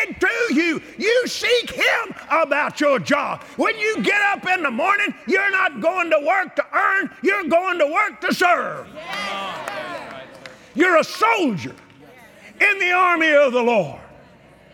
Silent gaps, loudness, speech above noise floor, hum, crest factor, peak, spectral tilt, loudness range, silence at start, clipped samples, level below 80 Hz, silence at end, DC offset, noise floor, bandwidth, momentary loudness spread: none; -19 LUFS; 29 dB; none; 16 dB; -4 dBFS; -3.5 dB/octave; 4 LU; 0 s; under 0.1%; -60 dBFS; 0.7 s; under 0.1%; -48 dBFS; 17 kHz; 13 LU